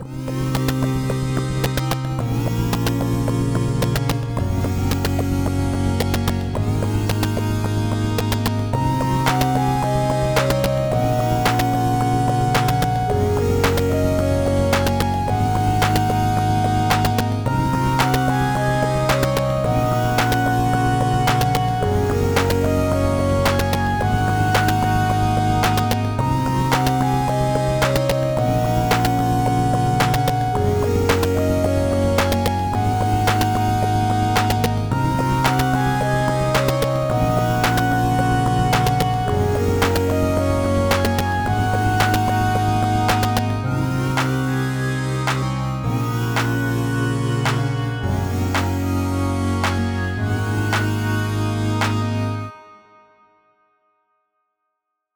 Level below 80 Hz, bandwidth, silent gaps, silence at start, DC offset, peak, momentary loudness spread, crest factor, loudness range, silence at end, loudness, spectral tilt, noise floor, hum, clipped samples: -34 dBFS; over 20 kHz; none; 0 s; under 0.1%; -2 dBFS; 4 LU; 18 dB; 3 LU; 2.4 s; -19 LUFS; -6 dB/octave; -78 dBFS; none; under 0.1%